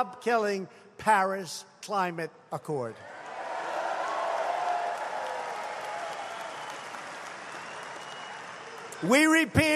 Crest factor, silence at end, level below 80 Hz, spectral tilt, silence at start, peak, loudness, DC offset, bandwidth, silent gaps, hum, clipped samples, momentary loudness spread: 24 dB; 0 s; -62 dBFS; -4 dB/octave; 0 s; -6 dBFS; -30 LUFS; under 0.1%; 14 kHz; none; none; under 0.1%; 16 LU